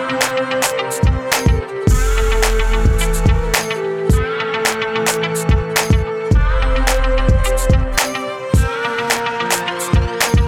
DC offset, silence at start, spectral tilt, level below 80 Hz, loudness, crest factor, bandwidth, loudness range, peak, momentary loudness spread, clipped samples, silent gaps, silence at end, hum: under 0.1%; 0 s; -4.5 dB/octave; -18 dBFS; -17 LUFS; 16 dB; 17.5 kHz; 1 LU; 0 dBFS; 2 LU; under 0.1%; none; 0 s; none